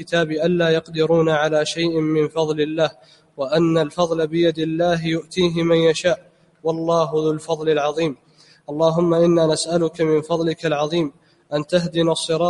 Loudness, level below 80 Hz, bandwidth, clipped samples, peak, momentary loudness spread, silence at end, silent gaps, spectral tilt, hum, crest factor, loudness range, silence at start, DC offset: -20 LUFS; -56 dBFS; 11.5 kHz; under 0.1%; -4 dBFS; 7 LU; 0 s; none; -5.5 dB/octave; none; 16 dB; 1 LU; 0 s; under 0.1%